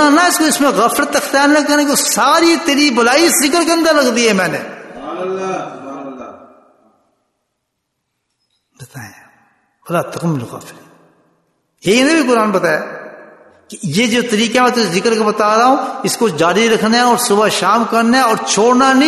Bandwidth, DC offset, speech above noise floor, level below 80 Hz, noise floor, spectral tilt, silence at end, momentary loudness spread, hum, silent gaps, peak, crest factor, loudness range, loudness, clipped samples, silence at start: 12.5 kHz; under 0.1%; 59 dB; -58 dBFS; -72 dBFS; -3 dB/octave; 0 s; 17 LU; none; none; 0 dBFS; 14 dB; 15 LU; -12 LUFS; under 0.1%; 0 s